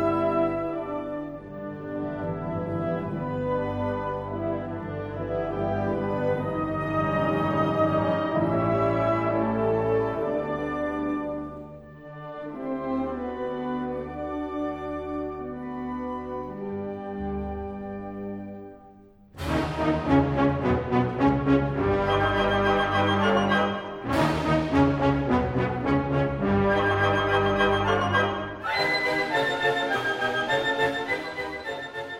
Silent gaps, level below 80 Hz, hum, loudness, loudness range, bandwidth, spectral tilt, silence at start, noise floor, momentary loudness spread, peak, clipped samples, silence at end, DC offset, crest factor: none; -44 dBFS; none; -26 LUFS; 9 LU; 15.5 kHz; -7 dB/octave; 0 s; -51 dBFS; 12 LU; -8 dBFS; under 0.1%; 0 s; under 0.1%; 18 dB